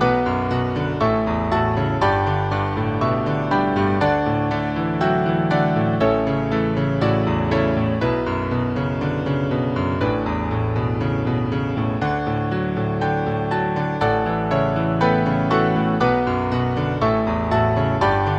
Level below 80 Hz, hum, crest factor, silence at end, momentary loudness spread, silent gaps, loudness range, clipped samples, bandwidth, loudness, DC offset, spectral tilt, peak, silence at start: -38 dBFS; none; 16 dB; 0 s; 4 LU; none; 3 LU; under 0.1%; 7.8 kHz; -20 LUFS; under 0.1%; -8.5 dB/octave; -4 dBFS; 0 s